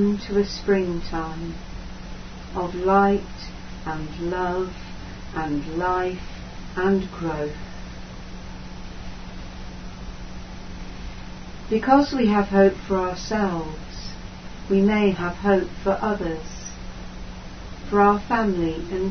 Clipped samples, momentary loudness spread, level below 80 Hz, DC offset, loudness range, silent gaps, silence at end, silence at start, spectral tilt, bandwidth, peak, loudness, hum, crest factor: under 0.1%; 20 LU; -38 dBFS; under 0.1%; 12 LU; none; 0 s; 0 s; -6.5 dB/octave; 6.6 kHz; -2 dBFS; -23 LUFS; none; 22 dB